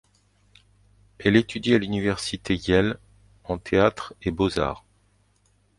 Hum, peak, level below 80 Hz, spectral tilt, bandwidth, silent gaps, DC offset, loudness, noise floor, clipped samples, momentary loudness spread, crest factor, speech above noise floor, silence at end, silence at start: 50 Hz at -45 dBFS; -4 dBFS; -46 dBFS; -6 dB/octave; 11.5 kHz; none; under 0.1%; -24 LUFS; -64 dBFS; under 0.1%; 12 LU; 22 dB; 41 dB; 1 s; 1.2 s